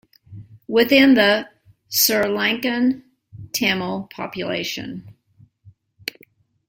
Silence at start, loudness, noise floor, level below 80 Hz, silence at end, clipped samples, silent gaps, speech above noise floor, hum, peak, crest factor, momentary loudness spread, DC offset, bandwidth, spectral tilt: 0.3 s; -19 LUFS; -55 dBFS; -60 dBFS; 1 s; under 0.1%; none; 37 dB; none; -2 dBFS; 20 dB; 19 LU; under 0.1%; 16.5 kHz; -3 dB/octave